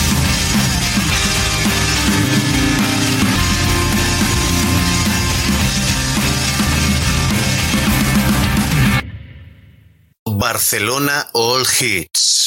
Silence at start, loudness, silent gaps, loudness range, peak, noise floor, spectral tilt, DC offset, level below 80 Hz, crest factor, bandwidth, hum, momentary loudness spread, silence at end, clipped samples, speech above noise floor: 0 s; -15 LUFS; 10.19-10.26 s; 3 LU; -4 dBFS; -47 dBFS; -3.5 dB/octave; under 0.1%; -26 dBFS; 12 dB; 17 kHz; none; 2 LU; 0 s; under 0.1%; 32 dB